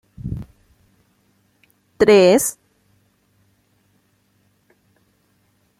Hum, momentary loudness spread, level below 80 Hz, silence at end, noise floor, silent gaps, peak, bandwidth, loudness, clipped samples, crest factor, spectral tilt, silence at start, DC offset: none; 20 LU; -50 dBFS; 3.3 s; -63 dBFS; none; -2 dBFS; 16 kHz; -16 LUFS; under 0.1%; 20 dB; -4.5 dB/octave; 0.25 s; under 0.1%